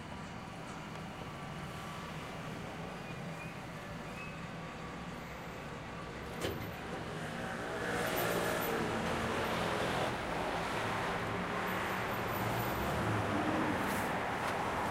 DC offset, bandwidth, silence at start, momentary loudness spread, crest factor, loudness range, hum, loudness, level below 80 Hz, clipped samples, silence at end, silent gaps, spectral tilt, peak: under 0.1%; 16 kHz; 0 s; 11 LU; 16 dB; 9 LU; none; -38 LUFS; -56 dBFS; under 0.1%; 0 s; none; -5 dB/octave; -22 dBFS